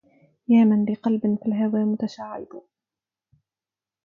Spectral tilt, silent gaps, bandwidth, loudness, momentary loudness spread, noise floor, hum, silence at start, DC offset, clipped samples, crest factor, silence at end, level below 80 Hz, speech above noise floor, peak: -9 dB/octave; none; 6.4 kHz; -22 LUFS; 19 LU; under -90 dBFS; none; 0.5 s; under 0.1%; under 0.1%; 16 dB; 1.45 s; -70 dBFS; over 69 dB; -8 dBFS